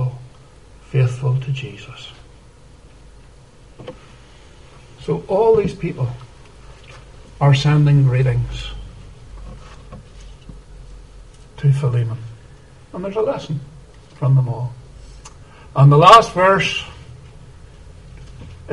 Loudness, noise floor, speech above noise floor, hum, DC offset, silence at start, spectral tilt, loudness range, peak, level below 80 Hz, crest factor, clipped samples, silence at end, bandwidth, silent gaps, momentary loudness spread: -16 LUFS; -45 dBFS; 30 dB; none; 0.2%; 0 s; -7 dB/octave; 13 LU; 0 dBFS; -40 dBFS; 20 dB; under 0.1%; 0 s; 10.5 kHz; none; 26 LU